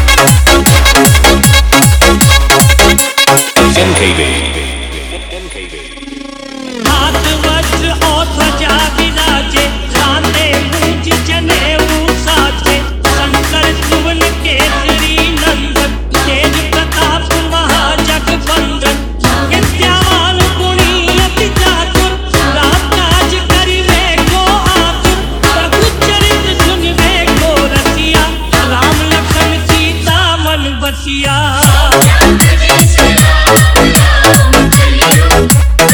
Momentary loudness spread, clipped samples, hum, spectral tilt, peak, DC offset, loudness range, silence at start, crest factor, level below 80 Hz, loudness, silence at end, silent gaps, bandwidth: 7 LU; 1%; none; -3.5 dB/octave; 0 dBFS; under 0.1%; 5 LU; 0 s; 8 dB; -16 dBFS; -8 LUFS; 0 s; none; over 20 kHz